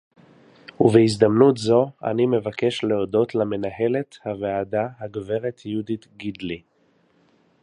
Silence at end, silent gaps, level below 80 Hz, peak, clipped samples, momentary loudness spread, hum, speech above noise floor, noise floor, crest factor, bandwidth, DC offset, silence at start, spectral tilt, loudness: 1.05 s; none; -58 dBFS; -2 dBFS; under 0.1%; 15 LU; none; 41 dB; -62 dBFS; 20 dB; 11 kHz; under 0.1%; 0.8 s; -7 dB/octave; -22 LUFS